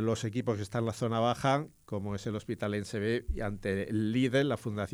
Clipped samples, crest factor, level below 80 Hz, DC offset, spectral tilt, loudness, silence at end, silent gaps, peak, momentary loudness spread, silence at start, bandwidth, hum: under 0.1%; 16 dB; -48 dBFS; under 0.1%; -6.5 dB/octave; -32 LUFS; 0 s; none; -16 dBFS; 8 LU; 0 s; 14.5 kHz; none